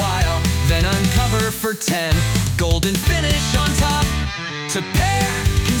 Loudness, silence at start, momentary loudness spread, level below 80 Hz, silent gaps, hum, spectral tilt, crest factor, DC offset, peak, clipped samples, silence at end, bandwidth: -18 LUFS; 0 s; 4 LU; -26 dBFS; none; none; -4.5 dB/octave; 12 dB; under 0.1%; -6 dBFS; under 0.1%; 0 s; 19.5 kHz